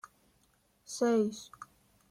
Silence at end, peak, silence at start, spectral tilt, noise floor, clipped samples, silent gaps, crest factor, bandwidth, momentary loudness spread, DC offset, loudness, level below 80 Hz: 0.45 s; -20 dBFS; 0.9 s; -5 dB/octave; -71 dBFS; under 0.1%; none; 16 dB; 15 kHz; 24 LU; under 0.1%; -32 LUFS; -76 dBFS